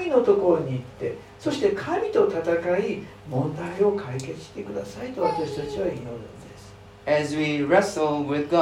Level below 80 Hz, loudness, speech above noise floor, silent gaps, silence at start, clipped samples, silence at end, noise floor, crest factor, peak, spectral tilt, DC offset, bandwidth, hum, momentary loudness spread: -56 dBFS; -25 LUFS; 21 dB; none; 0 s; under 0.1%; 0 s; -45 dBFS; 18 dB; -6 dBFS; -6 dB/octave; under 0.1%; 13 kHz; none; 15 LU